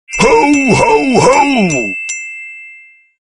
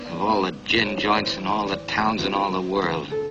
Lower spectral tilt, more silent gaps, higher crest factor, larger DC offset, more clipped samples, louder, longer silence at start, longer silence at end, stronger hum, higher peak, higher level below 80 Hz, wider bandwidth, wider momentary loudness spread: about the same, -4.5 dB/octave vs -5 dB/octave; neither; second, 12 dB vs 18 dB; neither; neither; first, -10 LUFS vs -23 LUFS; about the same, 0.1 s vs 0 s; first, 0.5 s vs 0 s; neither; first, 0 dBFS vs -6 dBFS; first, -38 dBFS vs -50 dBFS; first, 11 kHz vs 8.4 kHz; first, 17 LU vs 4 LU